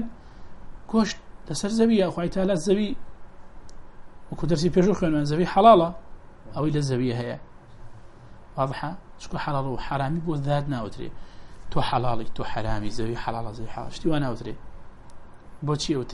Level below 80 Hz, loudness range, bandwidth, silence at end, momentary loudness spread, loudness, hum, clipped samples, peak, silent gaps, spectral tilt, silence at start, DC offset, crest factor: -42 dBFS; 9 LU; 11.5 kHz; 0 s; 17 LU; -25 LUFS; none; under 0.1%; -4 dBFS; none; -6.5 dB/octave; 0 s; under 0.1%; 22 dB